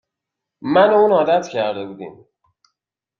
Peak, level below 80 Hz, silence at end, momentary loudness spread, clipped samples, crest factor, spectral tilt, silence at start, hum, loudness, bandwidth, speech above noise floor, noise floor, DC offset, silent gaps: -2 dBFS; -66 dBFS; 1.1 s; 20 LU; under 0.1%; 16 dB; -6 dB/octave; 0.65 s; none; -16 LUFS; 7.2 kHz; 66 dB; -83 dBFS; under 0.1%; none